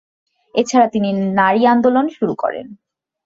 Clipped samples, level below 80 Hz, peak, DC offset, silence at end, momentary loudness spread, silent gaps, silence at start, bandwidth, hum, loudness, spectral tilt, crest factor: under 0.1%; -60 dBFS; -2 dBFS; under 0.1%; 0.5 s; 10 LU; none; 0.55 s; 7.8 kHz; none; -16 LUFS; -5.5 dB/octave; 14 dB